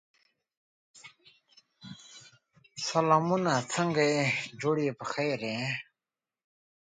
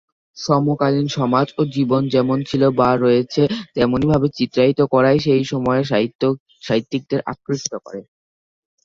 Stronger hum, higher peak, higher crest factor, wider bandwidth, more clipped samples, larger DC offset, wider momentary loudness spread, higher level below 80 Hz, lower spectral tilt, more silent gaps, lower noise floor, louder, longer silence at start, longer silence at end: neither; second, -8 dBFS vs -2 dBFS; first, 24 dB vs 16 dB; first, 9.6 kHz vs 7.6 kHz; neither; neither; first, 22 LU vs 9 LU; second, -76 dBFS vs -50 dBFS; second, -4.5 dB/octave vs -6.5 dB/octave; second, none vs 6.15-6.19 s, 6.40-6.46 s; about the same, under -90 dBFS vs under -90 dBFS; second, -29 LUFS vs -18 LUFS; first, 0.95 s vs 0.35 s; first, 1.1 s vs 0.8 s